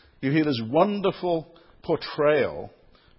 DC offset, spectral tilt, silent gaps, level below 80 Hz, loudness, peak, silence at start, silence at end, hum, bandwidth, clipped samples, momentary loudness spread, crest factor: under 0.1%; -10.5 dB/octave; none; -58 dBFS; -24 LUFS; -6 dBFS; 0.2 s; 0.5 s; none; 5.8 kHz; under 0.1%; 13 LU; 18 dB